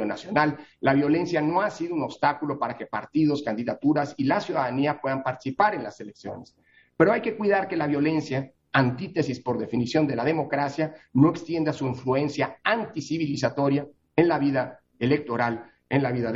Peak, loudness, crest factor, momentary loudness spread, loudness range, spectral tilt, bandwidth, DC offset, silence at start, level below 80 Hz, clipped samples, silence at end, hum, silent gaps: -4 dBFS; -25 LUFS; 20 dB; 8 LU; 1 LU; -7 dB/octave; 7.8 kHz; under 0.1%; 0 s; -62 dBFS; under 0.1%; 0 s; none; none